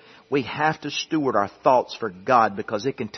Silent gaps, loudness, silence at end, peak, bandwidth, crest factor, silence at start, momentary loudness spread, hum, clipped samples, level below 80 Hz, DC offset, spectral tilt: none; -23 LUFS; 0 s; -4 dBFS; 6.4 kHz; 20 dB; 0.3 s; 8 LU; none; under 0.1%; -66 dBFS; under 0.1%; -5 dB/octave